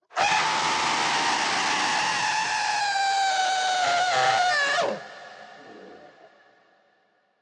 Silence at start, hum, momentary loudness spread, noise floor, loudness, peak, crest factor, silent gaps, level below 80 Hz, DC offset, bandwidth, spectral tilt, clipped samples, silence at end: 0.15 s; none; 4 LU; -66 dBFS; -23 LUFS; -10 dBFS; 16 dB; none; -70 dBFS; under 0.1%; 11 kHz; -0.5 dB/octave; under 0.1%; 1.35 s